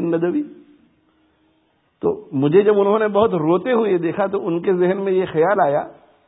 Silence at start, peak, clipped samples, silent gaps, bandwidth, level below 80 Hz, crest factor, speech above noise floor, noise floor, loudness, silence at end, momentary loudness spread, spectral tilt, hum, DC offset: 0 s; -2 dBFS; under 0.1%; none; 4 kHz; -58 dBFS; 16 dB; 45 dB; -63 dBFS; -18 LUFS; 0.35 s; 9 LU; -12 dB/octave; none; under 0.1%